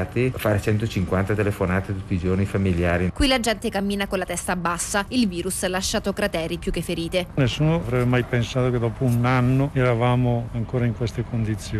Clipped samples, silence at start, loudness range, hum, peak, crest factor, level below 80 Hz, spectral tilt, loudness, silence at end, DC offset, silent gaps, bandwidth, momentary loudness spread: under 0.1%; 0 s; 3 LU; none; -10 dBFS; 12 dB; -38 dBFS; -5.5 dB/octave; -23 LUFS; 0 s; under 0.1%; none; 14 kHz; 6 LU